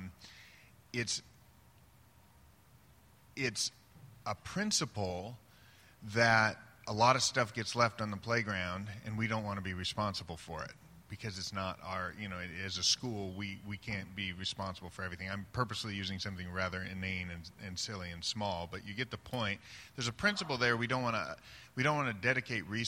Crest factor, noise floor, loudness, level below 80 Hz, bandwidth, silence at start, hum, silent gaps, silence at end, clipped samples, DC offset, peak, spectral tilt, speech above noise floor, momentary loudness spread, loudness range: 24 dB; -63 dBFS; -36 LUFS; -64 dBFS; 16.5 kHz; 0 s; none; none; 0 s; under 0.1%; under 0.1%; -12 dBFS; -3.5 dB/octave; 27 dB; 14 LU; 8 LU